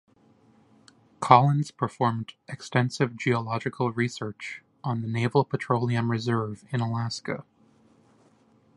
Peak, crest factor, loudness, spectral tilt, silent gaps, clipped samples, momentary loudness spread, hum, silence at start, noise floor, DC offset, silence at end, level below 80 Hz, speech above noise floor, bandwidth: 0 dBFS; 26 dB; -26 LUFS; -6.5 dB/octave; none; under 0.1%; 15 LU; none; 1.2 s; -61 dBFS; under 0.1%; 1.35 s; -64 dBFS; 35 dB; 11.5 kHz